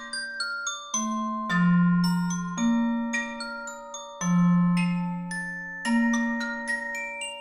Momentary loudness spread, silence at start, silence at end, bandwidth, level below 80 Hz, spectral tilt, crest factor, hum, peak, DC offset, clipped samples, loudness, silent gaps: 11 LU; 0 s; 0 s; 13 kHz; -58 dBFS; -5 dB/octave; 14 dB; none; -12 dBFS; under 0.1%; under 0.1%; -26 LUFS; none